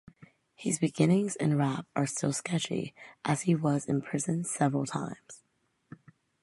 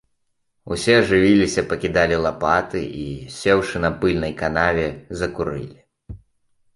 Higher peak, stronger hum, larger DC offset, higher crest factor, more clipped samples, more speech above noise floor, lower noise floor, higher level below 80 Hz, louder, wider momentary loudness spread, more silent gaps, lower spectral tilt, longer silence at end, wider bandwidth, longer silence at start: second, -10 dBFS vs -2 dBFS; neither; neither; about the same, 20 dB vs 18 dB; neither; second, 45 dB vs 50 dB; first, -75 dBFS vs -69 dBFS; second, -70 dBFS vs -42 dBFS; second, -30 LUFS vs -20 LUFS; about the same, 11 LU vs 13 LU; neither; about the same, -5.5 dB/octave vs -5.5 dB/octave; first, 1.05 s vs 0.6 s; about the same, 11.5 kHz vs 11.5 kHz; second, 0.2 s vs 0.65 s